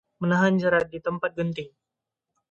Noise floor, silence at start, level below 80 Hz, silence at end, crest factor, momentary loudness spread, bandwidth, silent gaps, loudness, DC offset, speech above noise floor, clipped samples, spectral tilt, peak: -85 dBFS; 0.2 s; -62 dBFS; 0.8 s; 20 dB; 12 LU; 7.4 kHz; none; -24 LUFS; under 0.1%; 61 dB; under 0.1%; -7 dB/octave; -6 dBFS